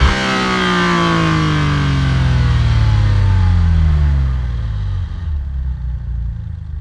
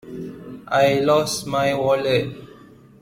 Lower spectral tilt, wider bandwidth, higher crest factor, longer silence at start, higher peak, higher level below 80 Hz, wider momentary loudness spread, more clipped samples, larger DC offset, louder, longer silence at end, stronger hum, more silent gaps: first, -6 dB/octave vs -4.5 dB/octave; second, 10 kHz vs 16.5 kHz; about the same, 14 dB vs 16 dB; about the same, 0 s vs 0.05 s; first, 0 dBFS vs -6 dBFS; first, -20 dBFS vs -54 dBFS; second, 10 LU vs 18 LU; neither; neither; first, -16 LUFS vs -20 LUFS; second, 0 s vs 0.55 s; neither; neither